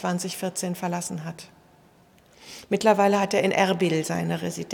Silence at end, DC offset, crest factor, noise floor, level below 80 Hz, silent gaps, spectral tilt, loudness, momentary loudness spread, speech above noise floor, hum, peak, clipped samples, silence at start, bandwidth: 0 s; under 0.1%; 20 dB; -56 dBFS; -68 dBFS; none; -5 dB/octave; -24 LUFS; 16 LU; 32 dB; none; -6 dBFS; under 0.1%; 0 s; 18.5 kHz